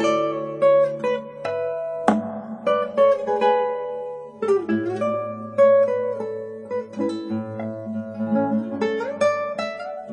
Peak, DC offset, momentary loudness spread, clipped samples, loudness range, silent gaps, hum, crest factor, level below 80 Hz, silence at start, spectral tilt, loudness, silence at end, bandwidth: 0 dBFS; under 0.1%; 12 LU; under 0.1%; 4 LU; none; none; 22 dB; -70 dBFS; 0 s; -6.5 dB/octave; -23 LUFS; 0 s; 10 kHz